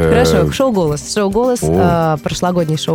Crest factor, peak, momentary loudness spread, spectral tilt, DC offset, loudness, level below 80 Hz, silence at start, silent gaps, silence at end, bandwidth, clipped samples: 14 dB; 0 dBFS; 5 LU; -5.5 dB/octave; under 0.1%; -14 LUFS; -32 dBFS; 0 s; none; 0 s; 17.5 kHz; under 0.1%